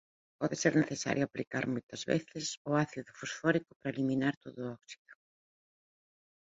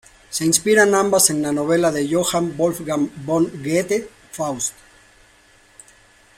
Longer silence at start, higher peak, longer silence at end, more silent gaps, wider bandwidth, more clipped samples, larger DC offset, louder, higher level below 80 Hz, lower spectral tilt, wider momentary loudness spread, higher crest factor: about the same, 0.4 s vs 0.3 s; second, -14 dBFS vs 0 dBFS; second, 1.35 s vs 1.65 s; first, 1.47-1.51 s, 1.83-1.89 s, 2.57-2.65 s, 3.76-3.80 s, 4.37-4.41 s, 4.98-5.05 s vs none; second, 8 kHz vs 16 kHz; neither; neither; second, -34 LUFS vs -19 LUFS; second, -72 dBFS vs -56 dBFS; first, -5 dB/octave vs -3.5 dB/octave; about the same, 13 LU vs 11 LU; about the same, 22 dB vs 20 dB